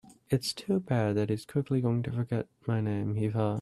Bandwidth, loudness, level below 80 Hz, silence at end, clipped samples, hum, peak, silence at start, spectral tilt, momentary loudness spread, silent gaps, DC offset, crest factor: 13 kHz; -31 LUFS; -62 dBFS; 0 s; under 0.1%; none; -14 dBFS; 0.05 s; -7 dB/octave; 4 LU; none; under 0.1%; 16 dB